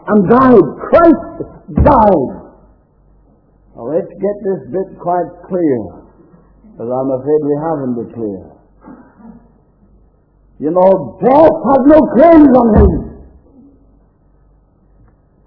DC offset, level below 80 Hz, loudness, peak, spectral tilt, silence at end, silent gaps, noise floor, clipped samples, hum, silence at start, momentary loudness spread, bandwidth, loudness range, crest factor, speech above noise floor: under 0.1%; -28 dBFS; -11 LUFS; 0 dBFS; -11.5 dB/octave; 2.35 s; none; -50 dBFS; 0.7%; none; 0.05 s; 16 LU; 5.4 kHz; 11 LU; 12 dB; 39 dB